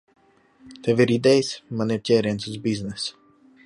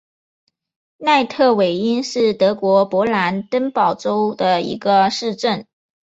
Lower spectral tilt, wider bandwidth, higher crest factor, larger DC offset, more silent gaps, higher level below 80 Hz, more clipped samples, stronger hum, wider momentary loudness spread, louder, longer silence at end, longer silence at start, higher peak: about the same, -5.5 dB/octave vs -5 dB/octave; first, 11.5 kHz vs 8 kHz; about the same, 18 dB vs 16 dB; neither; neither; about the same, -58 dBFS vs -60 dBFS; neither; neither; first, 11 LU vs 6 LU; second, -23 LUFS vs -17 LUFS; about the same, 0.55 s vs 0.5 s; second, 0.65 s vs 1 s; second, -6 dBFS vs -2 dBFS